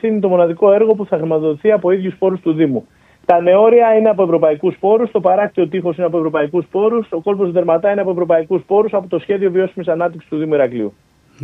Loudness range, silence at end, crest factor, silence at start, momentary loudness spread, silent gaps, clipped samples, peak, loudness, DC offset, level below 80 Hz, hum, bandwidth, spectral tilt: 3 LU; 0 s; 14 dB; 0.05 s; 7 LU; none; under 0.1%; 0 dBFS; -15 LUFS; under 0.1%; -60 dBFS; none; 3.9 kHz; -9.5 dB/octave